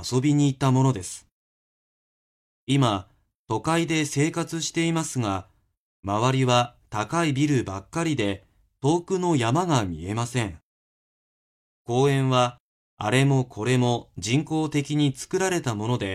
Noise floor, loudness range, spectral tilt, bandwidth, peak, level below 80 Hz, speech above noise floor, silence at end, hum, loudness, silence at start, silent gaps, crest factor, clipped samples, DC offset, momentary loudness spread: under -90 dBFS; 3 LU; -5.5 dB/octave; 13 kHz; -6 dBFS; -56 dBFS; over 67 dB; 0 s; none; -24 LUFS; 0 s; 1.32-2.67 s, 3.35-3.45 s, 5.77-6.03 s, 10.63-11.85 s, 12.60-12.97 s; 18 dB; under 0.1%; under 0.1%; 10 LU